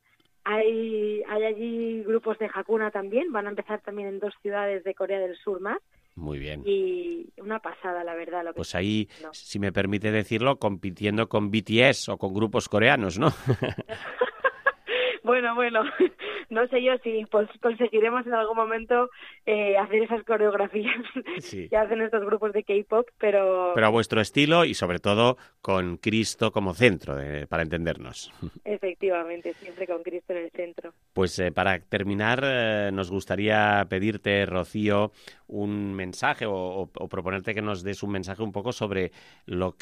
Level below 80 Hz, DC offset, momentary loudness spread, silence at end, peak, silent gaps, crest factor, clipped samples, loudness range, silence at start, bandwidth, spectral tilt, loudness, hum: -54 dBFS; under 0.1%; 12 LU; 0.1 s; -4 dBFS; none; 22 dB; under 0.1%; 8 LU; 0.45 s; 13.5 kHz; -5.5 dB/octave; -26 LUFS; none